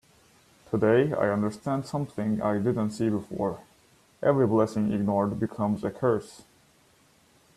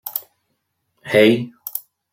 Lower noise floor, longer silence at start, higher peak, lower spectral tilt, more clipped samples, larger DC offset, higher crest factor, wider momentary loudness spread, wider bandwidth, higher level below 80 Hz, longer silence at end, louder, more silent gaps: second, -61 dBFS vs -72 dBFS; first, 0.7 s vs 0.05 s; second, -10 dBFS vs -2 dBFS; first, -8 dB/octave vs -5 dB/octave; neither; neither; about the same, 18 dB vs 20 dB; second, 9 LU vs 16 LU; second, 13 kHz vs 16.5 kHz; about the same, -62 dBFS vs -62 dBFS; first, 1.2 s vs 0.35 s; second, -27 LUFS vs -18 LUFS; neither